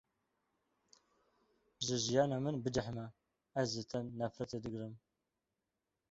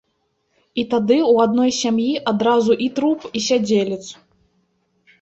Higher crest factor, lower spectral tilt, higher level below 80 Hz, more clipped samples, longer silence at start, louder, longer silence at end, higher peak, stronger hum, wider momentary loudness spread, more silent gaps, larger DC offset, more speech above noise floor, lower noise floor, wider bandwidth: first, 22 dB vs 16 dB; about the same, -5 dB/octave vs -4.5 dB/octave; second, -68 dBFS vs -60 dBFS; neither; first, 1.8 s vs 0.75 s; second, -39 LUFS vs -18 LUFS; about the same, 1.15 s vs 1.1 s; second, -18 dBFS vs -4 dBFS; neither; first, 13 LU vs 10 LU; neither; neither; about the same, 51 dB vs 51 dB; first, -89 dBFS vs -69 dBFS; about the same, 8 kHz vs 8.2 kHz